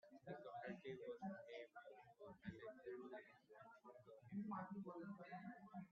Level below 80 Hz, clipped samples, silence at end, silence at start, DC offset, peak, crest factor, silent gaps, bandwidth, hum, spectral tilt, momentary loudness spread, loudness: -86 dBFS; under 0.1%; 0 s; 0.05 s; under 0.1%; -38 dBFS; 18 dB; none; 6.8 kHz; none; -6 dB/octave; 13 LU; -56 LUFS